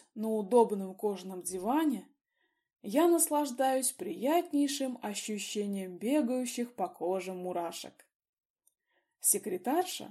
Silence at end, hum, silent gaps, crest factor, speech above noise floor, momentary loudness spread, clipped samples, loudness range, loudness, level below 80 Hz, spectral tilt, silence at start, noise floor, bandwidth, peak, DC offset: 0 s; none; 8.15-8.20 s, 8.29-8.33 s, 8.45-8.56 s; 20 dB; 48 dB; 10 LU; under 0.1%; 5 LU; -32 LUFS; -80 dBFS; -3.5 dB/octave; 0.15 s; -80 dBFS; 15.5 kHz; -12 dBFS; under 0.1%